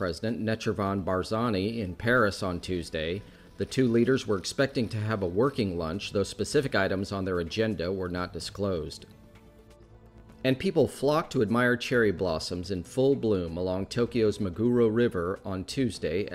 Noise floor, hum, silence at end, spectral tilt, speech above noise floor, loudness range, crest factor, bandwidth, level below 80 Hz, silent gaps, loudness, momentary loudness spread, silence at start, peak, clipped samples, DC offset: -53 dBFS; none; 0 s; -6 dB/octave; 25 dB; 4 LU; 16 dB; 15 kHz; -52 dBFS; none; -28 LUFS; 8 LU; 0 s; -12 dBFS; under 0.1%; under 0.1%